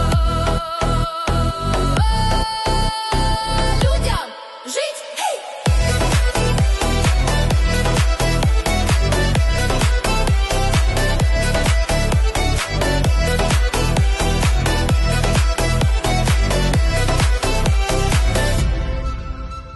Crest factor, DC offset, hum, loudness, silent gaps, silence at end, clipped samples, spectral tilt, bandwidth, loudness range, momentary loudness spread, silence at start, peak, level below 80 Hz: 12 dB; under 0.1%; none; -18 LUFS; none; 0 s; under 0.1%; -4.5 dB/octave; 12.5 kHz; 2 LU; 5 LU; 0 s; -4 dBFS; -20 dBFS